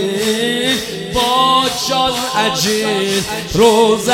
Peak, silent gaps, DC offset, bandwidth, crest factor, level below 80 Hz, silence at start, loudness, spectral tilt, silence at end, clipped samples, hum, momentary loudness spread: 0 dBFS; none; under 0.1%; 17 kHz; 14 dB; -40 dBFS; 0 s; -14 LUFS; -3 dB/octave; 0 s; under 0.1%; none; 6 LU